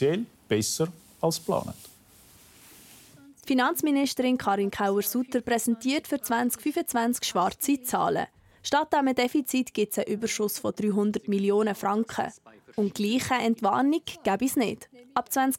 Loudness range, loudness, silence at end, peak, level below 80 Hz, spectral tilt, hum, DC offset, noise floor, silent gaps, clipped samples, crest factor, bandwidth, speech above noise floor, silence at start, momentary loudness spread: 3 LU; -27 LUFS; 0 s; -10 dBFS; -64 dBFS; -4 dB/octave; none; under 0.1%; -55 dBFS; none; under 0.1%; 18 dB; 17 kHz; 29 dB; 0 s; 6 LU